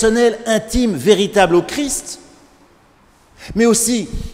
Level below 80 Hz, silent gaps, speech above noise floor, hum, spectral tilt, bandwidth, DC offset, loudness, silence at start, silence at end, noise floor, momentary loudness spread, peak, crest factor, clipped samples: -34 dBFS; none; 36 dB; none; -3.5 dB/octave; 16 kHz; under 0.1%; -15 LUFS; 0 s; 0 s; -51 dBFS; 10 LU; 0 dBFS; 16 dB; under 0.1%